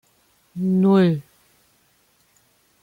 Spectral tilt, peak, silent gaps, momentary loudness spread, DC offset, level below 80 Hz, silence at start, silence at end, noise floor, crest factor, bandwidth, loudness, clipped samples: -9 dB/octave; -8 dBFS; none; 14 LU; under 0.1%; -64 dBFS; 0.55 s; 1.6 s; -62 dBFS; 14 dB; 4.9 kHz; -19 LUFS; under 0.1%